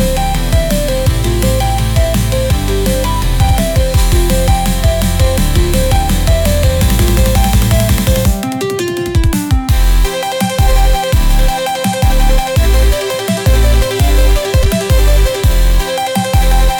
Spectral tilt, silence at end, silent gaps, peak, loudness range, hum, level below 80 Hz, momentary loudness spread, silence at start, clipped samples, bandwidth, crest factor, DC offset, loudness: -5 dB/octave; 0 s; none; -2 dBFS; 2 LU; none; -12 dBFS; 4 LU; 0 s; under 0.1%; 19.5 kHz; 8 dB; under 0.1%; -13 LUFS